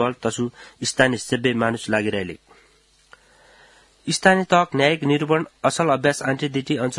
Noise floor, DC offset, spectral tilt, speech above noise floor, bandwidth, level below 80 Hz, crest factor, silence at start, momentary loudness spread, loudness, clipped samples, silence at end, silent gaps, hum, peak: -57 dBFS; under 0.1%; -4.5 dB/octave; 37 dB; 12 kHz; -60 dBFS; 22 dB; 0 s; 11 LU; -21 LUFS; under 0.1%; 0 s; none; none; 0 dBFS